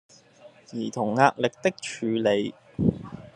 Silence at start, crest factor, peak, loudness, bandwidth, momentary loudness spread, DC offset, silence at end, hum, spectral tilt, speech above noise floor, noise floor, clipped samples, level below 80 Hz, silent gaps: 0.45 s; 24 dB; -2 dBFS; -26 LUFS; 11.5 kHz; 13 LU; under 0.1%; 0.1 s; none; -5.5 dB/octave; 28 dB; -53 dBFS; under 0.1%; -58 dBFS; none